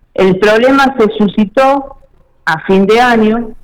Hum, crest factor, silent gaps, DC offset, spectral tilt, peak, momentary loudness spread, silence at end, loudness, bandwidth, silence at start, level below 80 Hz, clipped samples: none; 6 dB; none; under 0.1%; -6 dB/octave; -4 dBFS; 8 LU; 0.1 s; -10 LUFS; 15 kHz; 0.2 s; -38 dBFS; under 0.1%